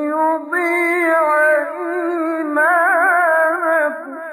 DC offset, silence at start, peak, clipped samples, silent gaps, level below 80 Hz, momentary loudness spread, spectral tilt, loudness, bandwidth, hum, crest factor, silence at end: under 0.1%; 0 s; -4 dBFS; under 0.1%; none; -82 dBFS; 7 LU; -2.5 dB/octave; -16 LUFS; 14 kHz; none; 12 dB; 0 s